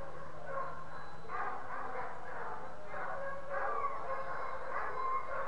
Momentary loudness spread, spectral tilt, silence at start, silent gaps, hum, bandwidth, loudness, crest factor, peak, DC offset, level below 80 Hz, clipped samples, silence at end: 9 LU; -5.5 dB/octave; 0 s; none; none; 11 kHz; -41 LUFS; 16 dB; -24 dBFS; 2%; -64 dBFS; under 0.1%; 0 s